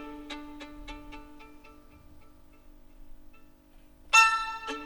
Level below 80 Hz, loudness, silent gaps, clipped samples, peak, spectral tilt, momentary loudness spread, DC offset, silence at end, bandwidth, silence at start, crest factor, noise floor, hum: -52 dBFS; -22 LUFS; none; under 0.1%; -8 dBFS; 0 dB/octave; 27 LU; under 0.1%; 0 s; over 20 kHz; 0 s; 24 dB; -55 dBFS; none